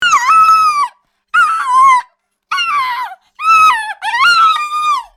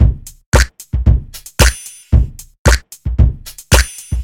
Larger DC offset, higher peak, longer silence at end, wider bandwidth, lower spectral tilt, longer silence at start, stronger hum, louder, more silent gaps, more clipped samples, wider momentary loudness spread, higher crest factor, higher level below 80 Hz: neither; about the same, 0 dBFS vs 0 dBFS; first, 0.15 s vs 0 s; about the same, 16.5 kHz vs 17 kHz; second, 1.5 dB/octave vs -4.5 dB/octave; about the same, 0 s vs 0 s; neither; first, -10 LUFS vs -15 LUFS; second, none vs 0.46-0.52 s, 2.59-2.65 s; second, under 0.1% vs 0.1%; about the same, 11 LU vs 11 LU; about the same, 12 dB vs 14 dB; second, -56 dBFS vs -16 dBFS